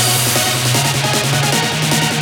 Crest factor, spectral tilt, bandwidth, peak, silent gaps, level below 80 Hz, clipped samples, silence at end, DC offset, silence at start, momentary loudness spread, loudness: 14 dB; -3 dB/octave; 20 kHz; -2 dBFS; none; -46 dBFS; under 0.1%; 0 s; under 0.1%; 0 s; 2 LU; -14 LUFS